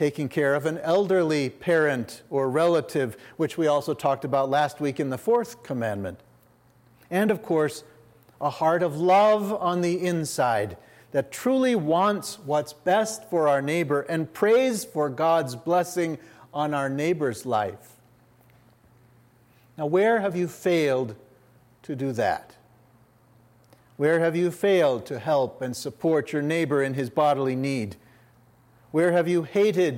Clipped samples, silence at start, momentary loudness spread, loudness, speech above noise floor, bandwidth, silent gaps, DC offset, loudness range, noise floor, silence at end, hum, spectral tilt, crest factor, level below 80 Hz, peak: under 0.1%; 0 s; 9 LU; -25 LUFS; 35 dB; 16.5 kHz; none; under 0.1%; 5 LU; -59 dBFS; 0 s; none; -5.5 dB/octave; 16 dB; -70 dBFS; -8 dBFS